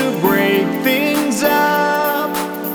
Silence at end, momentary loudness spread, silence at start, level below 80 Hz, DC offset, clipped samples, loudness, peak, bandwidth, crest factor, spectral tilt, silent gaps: 0 s; 5 LU; 0 s; -56 dBFS; under 0.1%; under 0.1%; -16 LUFS; -2 dBFS; over 20 kHz; 14 dB; -4 dB/octave; none